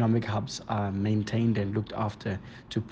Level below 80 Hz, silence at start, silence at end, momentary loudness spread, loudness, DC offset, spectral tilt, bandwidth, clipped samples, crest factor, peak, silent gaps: -56 dBFS; 0 s; 0 s; 9 LU; -30 LUFS; under 0.1%; -7 dB/octave; 8.2 kHz; under 0.1%; 16 dB; -14 dBFS; none